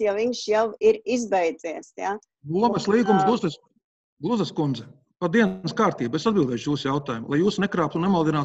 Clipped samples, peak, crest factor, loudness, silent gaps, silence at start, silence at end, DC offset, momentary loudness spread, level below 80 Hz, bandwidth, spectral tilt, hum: under 0.1%; -6 dBFS; 18 dB; -24 LUFS; 3.84-4.17 s; 0 s; 0 s; under 0.1%; 10 LU; -60 dBFS; 8.4 kHz; -6 dB/octave; none